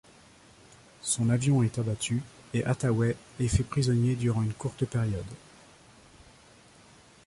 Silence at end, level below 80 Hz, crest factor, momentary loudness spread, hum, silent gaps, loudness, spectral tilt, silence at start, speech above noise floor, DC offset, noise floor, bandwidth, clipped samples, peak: 1.9 s; -46 dBFS; 18 dB; 9 LU; none; none; -29 LUFS; -6 dB/octave; 1.05 s; 29 dB; under 0.1%; -56 dBFS; 11.5 kHz; under 0.1%; -12 dBFS